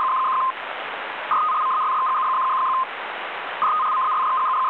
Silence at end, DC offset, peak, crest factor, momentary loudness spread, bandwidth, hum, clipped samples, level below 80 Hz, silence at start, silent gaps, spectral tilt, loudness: 0 s; under 0.1%; -12 dBFS; 10 dB; 9 LU; 4.5 kHz; none; under 0.1%; -78 dBFS; 0 s; none; -4 dB/octave; -22 LUFS